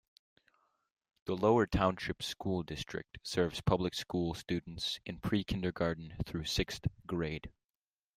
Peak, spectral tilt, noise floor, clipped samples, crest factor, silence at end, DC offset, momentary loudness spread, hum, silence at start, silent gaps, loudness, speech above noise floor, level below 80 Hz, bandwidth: -14 dBFS; -5.5 dB/octave; under -90 dBFS; under 0.1%; 22 dB; 0.65 s; under 0.1%; 11 LU; none; 1.25 s; none; -35 LUFS; over 55 dB; -52 dBFS; 15.5 kHz